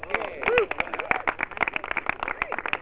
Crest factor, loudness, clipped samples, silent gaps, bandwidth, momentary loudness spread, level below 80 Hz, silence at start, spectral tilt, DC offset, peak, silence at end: 24 dB; -26 LUFS; under 0.1%; none; 4 kHz; 6 LU; -52 dBFS; 0 s; -1 dB/octave; 0.4%; -4 dBFS; 0 s